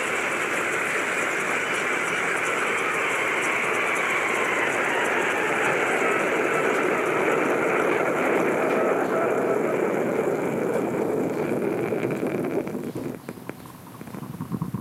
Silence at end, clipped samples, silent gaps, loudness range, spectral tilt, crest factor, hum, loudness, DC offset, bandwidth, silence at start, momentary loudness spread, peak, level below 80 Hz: 0 s; under 0.1%; none; 5 LU; -4 dB/octave; 16 dB; none; -23 LUFS; under 0.1%; 16 kHz; 0 s; 10 LU; -10 dBFS; -66 dBFS